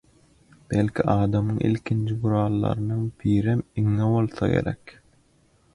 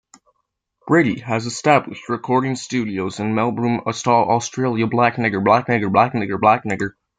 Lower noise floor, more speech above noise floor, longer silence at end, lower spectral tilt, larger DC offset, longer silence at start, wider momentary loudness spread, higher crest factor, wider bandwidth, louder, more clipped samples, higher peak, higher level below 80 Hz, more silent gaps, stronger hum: second, -61 dBFS vs -73 dBFS; second, 38 dB vs 55 dB; first, 0.85 s vs 0.3 s; first, -9 dB/octave vs -5.5 dB/octave; neither; second, 0.7 s vs 0.85 s; second, 4 LU vs 7 LU; about the same, 18 dB vs 18 dB; first, 11 kHz vs 9.4 kHz; second, -24 LUFS vs -19 LUFS; neither; second, -6 dBFS vs -2 dBFS; first, -46 dBFS vs -60 dBFS; neither; neither